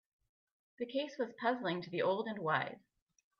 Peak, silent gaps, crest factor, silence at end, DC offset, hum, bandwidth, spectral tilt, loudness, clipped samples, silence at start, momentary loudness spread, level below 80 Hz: -18 dBFS; none; 22 dB; 0.6 s; under 0.1%; none; 6.8 kHz; -6.5 dB/octave; -37 LUFS; under 0.1%; 0.8 s; 8 LU; -84 dBFS